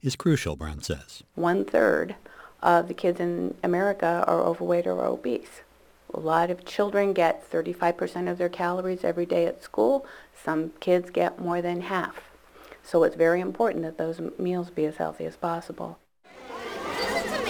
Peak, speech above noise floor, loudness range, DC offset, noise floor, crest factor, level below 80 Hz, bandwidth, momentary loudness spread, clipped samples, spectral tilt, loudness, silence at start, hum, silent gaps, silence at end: -6 dBFS; 24 dB; 3 LU; under 0.1%; -50 dBFS; 20 dB; -54 dBFS; over 20 kHz; 12 LU; under 0.1%; -6 dB/octave; -26 LUFS; 0.05 s; none; none; 0 s